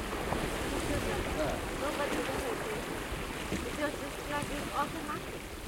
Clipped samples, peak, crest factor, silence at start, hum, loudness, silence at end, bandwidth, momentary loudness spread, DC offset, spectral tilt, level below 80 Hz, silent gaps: under 0.1%; -16 dBFS; 18 dB; 0 s; none; -35 LUFS; 0 s; 16.5 kHz; 5 LU; under 0.1%; -4 dB/octave; -44 dBFS; none